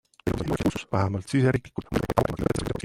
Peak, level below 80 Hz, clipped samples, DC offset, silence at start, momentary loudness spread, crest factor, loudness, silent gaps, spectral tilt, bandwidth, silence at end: -4 dBFS; -42 dBFS; under 0.1%; under 0.1%; 0.25 s; 7 LU; 22 dB; -27 LUFS; none; -7 dB/octave; 16.5 kHz; 0.05 s